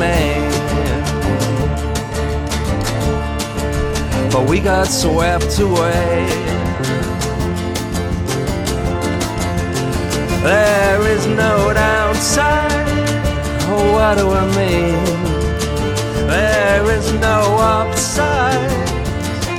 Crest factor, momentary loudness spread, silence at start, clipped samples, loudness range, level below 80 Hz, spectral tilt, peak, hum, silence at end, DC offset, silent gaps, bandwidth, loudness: 12 dB; 7 LU; 0 s; under 0.1%; 5 LU; -24 dBFS; -5 dB/octave; -4 dBFS; none; 0 s; under 0.1%; none; 18 kHz; -16 LUFS